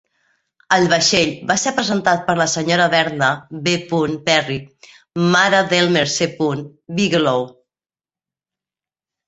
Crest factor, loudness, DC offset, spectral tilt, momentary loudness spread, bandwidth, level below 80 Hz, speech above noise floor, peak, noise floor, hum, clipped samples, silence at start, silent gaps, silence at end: 18 dB; -17 LUFS; under 0.1%; -3.5 dB/octave; 9 LU; 8.2 kHz; -56 dBFS; over 73 dB; 0 dBFS; under -90 dBFS; none; under 0.1%; 0.7 s; none; 1.75 s